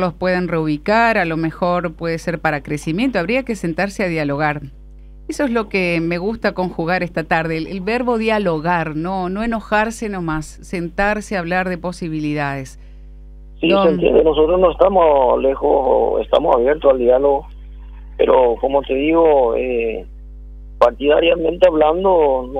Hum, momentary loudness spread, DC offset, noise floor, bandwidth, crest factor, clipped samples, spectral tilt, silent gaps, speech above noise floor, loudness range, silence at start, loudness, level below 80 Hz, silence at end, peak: none; 9 LU; under 0.1%; -38 dBFS; 12.5 kHz; 16 dB; under 0.1%; -6.5 dB/octave; none; 21 dB; 6 LU; 0 s; -17 LUFS; -36 dBFS; 0 s; 0 dBFS